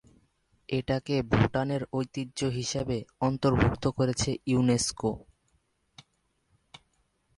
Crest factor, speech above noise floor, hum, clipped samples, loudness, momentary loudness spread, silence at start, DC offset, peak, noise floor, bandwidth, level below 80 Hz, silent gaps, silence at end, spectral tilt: 22 dB; 46 dB; none; under 0.1%; -29 LUFS; 8 LU; 0.7 s; under 0.1%; -8 dBFS; -74 dBFS; 11.5 kHz; -48 dBFS; none; 2.2 s; -5.5 dB/octave